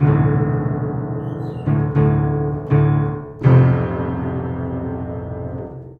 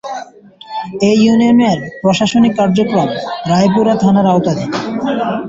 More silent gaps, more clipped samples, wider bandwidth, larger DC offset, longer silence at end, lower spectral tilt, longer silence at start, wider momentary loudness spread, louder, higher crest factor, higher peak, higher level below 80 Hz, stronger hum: neither; neither; second, 3.7 kHz vs 7.8 kHz; neither; about the same, 0.05 s vs 0 s; first, -11.5 dB/octave vs -6.5 dB/octave; about the same, 0 s vs 0.05 s; about the same, 13 LU vs 11 LU; second, -19 LUFS vs -12 LUFS; about the same, 16 dB vs 12 dB; about the same, -2 dBFS vs -2 dBFS; first, -36 dBFS vs -48 dBFS; neither